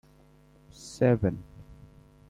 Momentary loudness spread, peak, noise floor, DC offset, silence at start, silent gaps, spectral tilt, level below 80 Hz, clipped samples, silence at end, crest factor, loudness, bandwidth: 23 LU; -10 dBFS; -58 dBFS; under 0.1%; 0.8 s; none; -7.5 dB/octave; -54 dBFS; under 0.1%; 0.55 s; 20 dB; -27 LUFS; 12 kHz